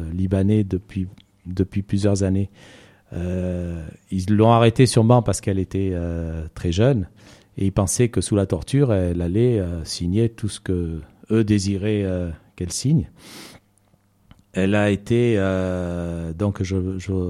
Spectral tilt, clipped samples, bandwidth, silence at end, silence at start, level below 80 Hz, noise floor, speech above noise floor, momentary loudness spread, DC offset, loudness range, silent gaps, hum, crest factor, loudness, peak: -6.5 dB/octave; under 0.1%; 13.5 kHz; 0 s; 0 s; -42 dBFS; -60 dBFS; 40 dB; 14 LU; under 0.1%; 5 LU; none; none; 18 dB; -21 LUFS; -4 dBFS